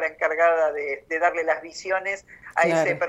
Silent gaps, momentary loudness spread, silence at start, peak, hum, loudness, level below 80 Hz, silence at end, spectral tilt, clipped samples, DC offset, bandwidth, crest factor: none; 10 LU; 0 s; -6 dBFS; none; -23 LUFS; -64 dBFS; 0 s; -4.5 dB/octave; under 0.1%; under 0.1%; 11.5 kHz; 18 dB